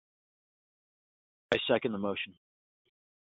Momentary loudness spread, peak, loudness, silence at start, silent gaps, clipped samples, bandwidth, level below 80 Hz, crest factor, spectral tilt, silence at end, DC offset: 9 LU; -10 dBFS; -32 LUFS; 1.5 s; none; under 0.1%; 4 kHz; -70 dBFS; 26 dB; -2.5 dB/octave; 1 s; under 0.1%